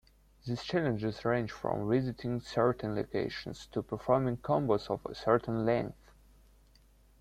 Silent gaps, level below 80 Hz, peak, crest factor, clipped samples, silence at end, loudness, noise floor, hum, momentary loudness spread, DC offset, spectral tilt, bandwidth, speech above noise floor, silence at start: none; -58 dBFS; -12 dBFS; 20 dB; under 0.1%; 1.3 s; -33 LUFS; -62 dBFS; none; 9 LU; under 0.1%; -7.5 dB/octave; 14 kHz; 30 dB; 0.45 s